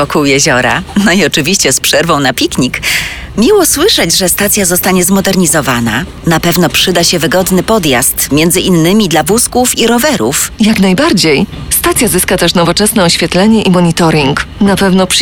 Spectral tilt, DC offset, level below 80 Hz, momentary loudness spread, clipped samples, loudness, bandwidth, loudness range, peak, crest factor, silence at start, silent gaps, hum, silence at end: -3.5 dB/octave; 0.6%; -30 dBFS; 4 LU; under 0.1%; -8 LUFS; over 20 kHz; 1 LU; 0 dBFS; 8 dB; 0 s; none; none; 0 s